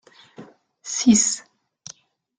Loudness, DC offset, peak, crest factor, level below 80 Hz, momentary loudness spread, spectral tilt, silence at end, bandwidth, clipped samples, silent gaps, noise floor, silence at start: -19 LUFS; under 0.1%; -4 dBFS; 20 dB; -60 dBFS; 25 LU; -2.5 dB/octave; 1 s; 9.8 kHz; under 0.1%; none; -49 dBFS; 0.4 s